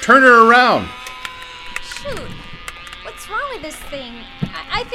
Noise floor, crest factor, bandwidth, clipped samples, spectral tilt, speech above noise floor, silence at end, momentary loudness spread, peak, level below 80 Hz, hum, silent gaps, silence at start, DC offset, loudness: -33 dBFS; 16 dB; 15.5 kHz; under 0.1%; -4 dB/octave; 19 dB; 0 s; 24 LU; 0 dBFS; -42 dBFS; none; none; 0 s; under 0.1%; -13 LUFS